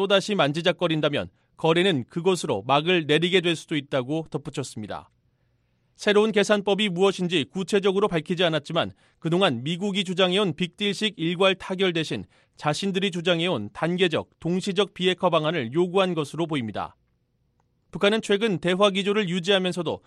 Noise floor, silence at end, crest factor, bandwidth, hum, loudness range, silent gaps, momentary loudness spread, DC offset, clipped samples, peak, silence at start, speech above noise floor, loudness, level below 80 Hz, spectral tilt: -69 dBFS; 0.1 s; 18 dB; 12.5 kHz; none; 3 LU; none; 9 LU; under 0.1%; under 0.1%; -6 dBFS; 0 s; 46 dB; -24 LUFS; -62 dBFS; -5 dB/octave